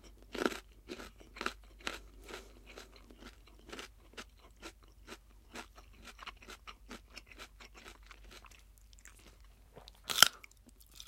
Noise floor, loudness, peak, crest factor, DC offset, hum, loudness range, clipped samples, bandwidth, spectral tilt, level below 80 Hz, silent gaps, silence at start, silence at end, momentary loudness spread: -61 dBFS; -34 LUFS; -2 dBFS; 40 dB; under 0.1%; none; 18 LU; under 0.1%; 16.5 kHz; -0.5 dB/octave; -60 dBFS; none; 0.05 s; 0 s; 19 LU